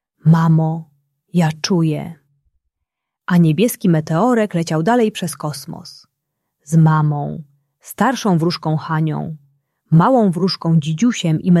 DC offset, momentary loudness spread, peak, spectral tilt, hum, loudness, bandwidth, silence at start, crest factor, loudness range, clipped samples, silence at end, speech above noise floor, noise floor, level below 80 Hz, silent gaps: under 0.1%; 15 LU; -2 dBFS; -6.5 dB/octave; none; -16 LUFS; 13 kHz; 0.25 s; 14 dB; 2 LU; under 0.1%; 0 s; 63 dB; -79 dBFS; -58 dBFS; none